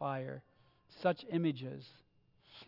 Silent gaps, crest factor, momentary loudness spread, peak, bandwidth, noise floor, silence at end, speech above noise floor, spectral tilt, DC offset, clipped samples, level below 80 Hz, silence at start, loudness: none; 22 dB; 19 LU; -18 dBFS; 5.8 kHz; -67 dBFS; 0 s; 30 dB; -6 dB/octave; under 0.1%; under 0.1%; -80 dBFS; 0 s; -38 LUFS